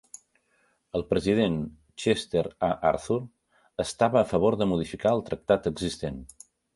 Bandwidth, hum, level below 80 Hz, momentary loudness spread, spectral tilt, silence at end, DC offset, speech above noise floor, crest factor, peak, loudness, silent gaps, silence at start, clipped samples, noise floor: 11.5 kHz; none; -50 dBFS; 11 LU; -6 dB/octave; 0.5 s; under 0.1%; 43 dB; 20 dB; -6 dBFS; -27 LUFS; none; 0.95 s; under 0.1%; -69 dBFS